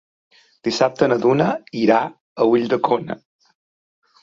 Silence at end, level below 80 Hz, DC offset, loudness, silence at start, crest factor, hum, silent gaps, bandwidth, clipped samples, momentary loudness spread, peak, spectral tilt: 1.05 s; -60 dBFS; under 0.1%; -19 LUFS; 0.65 s; 18 dB; none; 2.20-2.36 s; 7.6 kHz; under 0.1%; 11 LU; -2 dBFS; -6 dB/octave